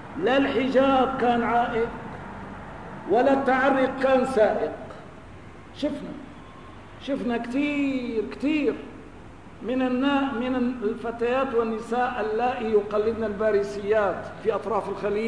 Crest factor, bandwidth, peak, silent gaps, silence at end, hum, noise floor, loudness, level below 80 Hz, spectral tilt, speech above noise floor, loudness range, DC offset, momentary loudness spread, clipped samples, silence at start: 16 dB; 10.5 kHz; -10 dBFS; none; 0 s; none; -44 dBFS; -24 LUFS; -52 dBFS; -6 dB/octave; 21 dB; 6 LU; 0.3%; 20 LU; under 0.1%; 0 s